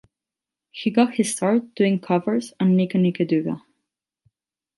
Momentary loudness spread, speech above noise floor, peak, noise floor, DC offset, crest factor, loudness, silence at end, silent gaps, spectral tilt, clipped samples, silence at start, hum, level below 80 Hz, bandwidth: 8 LU; 68 dB; -4 dBFS; -88 dBFS; under 0.1%; 18 dB; -21 LUFS; 1.2 s; none; -6 dB/octave; under 0.1%; 0.75 s; none; -70 dBFS; 11.5 kHz